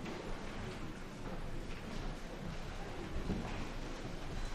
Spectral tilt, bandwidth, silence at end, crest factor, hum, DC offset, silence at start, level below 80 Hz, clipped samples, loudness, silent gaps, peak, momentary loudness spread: -5.5 dB/octave; 13 kHz; 0 s; 16 dB; none; under 0.1%; 0 s; -44 dBFS; under 0.1%; -45 LUFS; none; -26 dBFS; 5 LU